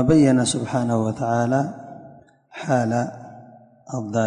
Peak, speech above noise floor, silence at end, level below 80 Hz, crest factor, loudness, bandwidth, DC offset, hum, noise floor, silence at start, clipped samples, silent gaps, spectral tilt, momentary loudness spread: -6 dBFS; 28 dB; 0 s; -52 dBFS; 16 dB; -21 LUFS; 10.5 kHz; under 0.1%; none; -47 dBFS; 0 s; under 0.1%; none; -6 dB/octave; 24 LU